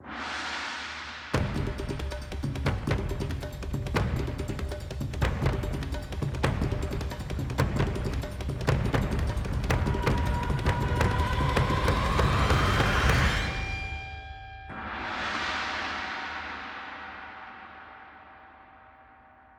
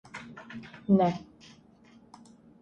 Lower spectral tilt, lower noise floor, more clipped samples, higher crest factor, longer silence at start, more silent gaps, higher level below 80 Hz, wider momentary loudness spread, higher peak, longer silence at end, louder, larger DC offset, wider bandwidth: second, -5.5 dB/octave vs -8 dB/octave; about the same, -55 dBFS vs -57 dBFS; neither; about the same, 22 dB vs 22 dB; second, 0 s vs 0.15 s; neither; first, -34 dBFS vs -66 dBFS; second, 15 LU vs 20 LU; first, -8 dBFS vs -12 dBFS; second, 0.45 s vs 1.4 s; about the same, -29 LUFS vs -27 LUFS; neither; first, 16.5 kHz vs 8.2 kHz